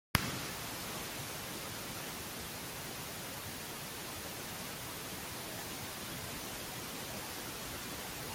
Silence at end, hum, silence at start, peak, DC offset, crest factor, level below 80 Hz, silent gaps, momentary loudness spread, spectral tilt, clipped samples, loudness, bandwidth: 0 s; none; 0.15 s; -6 dBFS; under 0.1%; 36 dB; -60 dBFS; none; 2 LU; -2.5 dB/octave; under 0.1%; -41 LUFS; 17 kHz